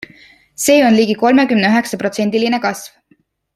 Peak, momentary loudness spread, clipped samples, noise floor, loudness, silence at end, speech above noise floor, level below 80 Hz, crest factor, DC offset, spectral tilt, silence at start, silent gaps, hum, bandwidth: 0 dBFS; 9 LU; under 0.1%; -57 dBFS; -14 LUFS; 0.7 s; 44 dB; -58 dBFS; 14 dB; under 0.1%; -4 dB/octave; 0.6 s; none; none; 14.5 kHz